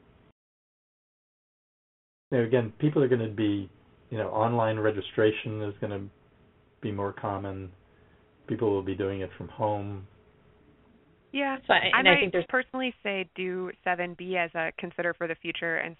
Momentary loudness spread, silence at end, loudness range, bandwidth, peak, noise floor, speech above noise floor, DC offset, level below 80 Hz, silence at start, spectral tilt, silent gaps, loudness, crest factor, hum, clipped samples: 13 LU; 0.05 s; 8 LU; 4 kHz; -4 dBFS; -61 dBFS; 33 dB; under 0.1%; -66 dBFS; 2.3 s; -3.5 dB/octave; none; -28 LUFS; 26 dB; none; under 0.1%